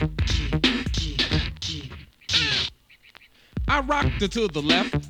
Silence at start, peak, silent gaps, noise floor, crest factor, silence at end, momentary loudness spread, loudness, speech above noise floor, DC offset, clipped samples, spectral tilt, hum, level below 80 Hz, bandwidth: 0 s; -6 dBFS; none; -53 dBFS; 20 dB; 0 s; 11 LU; -24 LUFS; 30 dB; under 0.1%; under 0.1%; -4.5 dB/octave; none; -34 dBFS; 13 kHz